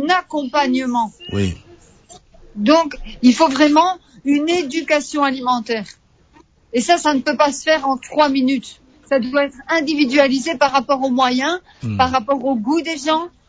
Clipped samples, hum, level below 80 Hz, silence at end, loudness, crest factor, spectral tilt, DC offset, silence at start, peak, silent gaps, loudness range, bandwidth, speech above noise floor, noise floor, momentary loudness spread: under 0.1%; none; -46 dBFS; 0.2 s; -17 LUFS; 16 dB; -4.5 dB/octave; under 0.1%; 0 s; -2 dBFS; none; 3 LU; 8 kHz; 35 dB; -51 dBFS; 10 LU